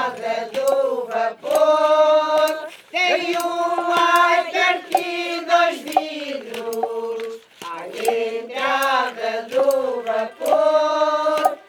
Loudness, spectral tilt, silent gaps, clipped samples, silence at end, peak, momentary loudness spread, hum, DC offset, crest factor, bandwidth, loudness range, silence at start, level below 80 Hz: -20 LUFS; -2 dB/octave; none; under 0.1%; 0.1 s; -2 dBFS; 12 LU; none; under 0.1%; 18 dB; 19.5 kHz; 6 LU; 0 s; -82 dBFS